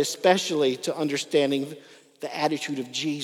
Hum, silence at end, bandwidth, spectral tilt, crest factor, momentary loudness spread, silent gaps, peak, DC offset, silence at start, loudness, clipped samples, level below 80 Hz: none; 0 s; 17 kHz; -3.5 dB/octave; 20 dB; 14 LU; none; -6 dBFS; under 0.1%; 0 s; -25 LUFS; under 0.1%; -86 dBFS